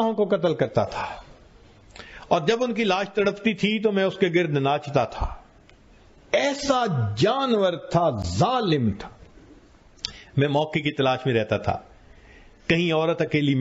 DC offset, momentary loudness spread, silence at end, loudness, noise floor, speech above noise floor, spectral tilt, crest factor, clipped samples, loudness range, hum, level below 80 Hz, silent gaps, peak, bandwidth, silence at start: under 0.1%; 12 LU; 0 s; -23 LUFS; -52 dBFS; 30 dB; -6 dB/octave; 18 dB; under 0.1%; 3 LU; none; -46 dBFS; none; -6 dBFS; 8 kHz; 0 s